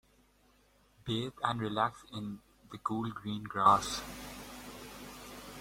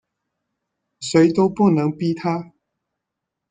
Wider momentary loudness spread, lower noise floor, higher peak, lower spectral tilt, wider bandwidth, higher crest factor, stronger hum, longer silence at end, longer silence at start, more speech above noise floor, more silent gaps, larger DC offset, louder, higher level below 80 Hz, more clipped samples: first, 20 LU vs 10 LU; second, -67 dBFS vs -82 dBFS; second, -12 dBFS vs -4 dBFS; second, -4.5 dB/octave vs -6.5 dB/octave; first, 16.5 kHz vs 9.4 kHz; first, 24 dB vs 18 dB; neither; second, 0 s vs 1.05 s; about the same, 1.05 s vs 1 s; second, 34 dB vs 64 dB; neither; neither; second, -33 LUFS vs -19 LUFS; about the same, -60 dBFS vs -60 dBFS; neither